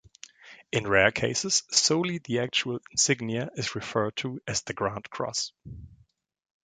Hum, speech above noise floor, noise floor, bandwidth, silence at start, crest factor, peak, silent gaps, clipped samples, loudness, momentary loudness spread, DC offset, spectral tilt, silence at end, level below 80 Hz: none; 23 dB; -51 dBFS; 11 kHz; 0.25 s; 26 dB; -4 dBFS; none; under 0.1%; -27 LUFS; 12 LU; under 0.1%; -2.5 dB/octave; 0.7 s; -58 dBFS